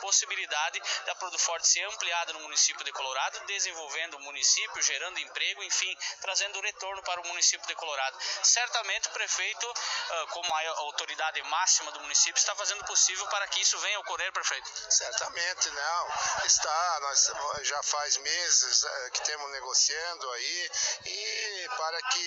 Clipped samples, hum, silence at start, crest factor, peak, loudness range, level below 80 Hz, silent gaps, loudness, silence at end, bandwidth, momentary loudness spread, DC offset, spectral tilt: under 0.1%; none; 0 s; 22 dB; -8 dBFS; 3 LU; -72 dBFS; none; -28 LUFS; 0 s; 10.5 kHz; 9 LU; under 0.1%; 3.5 dB/octave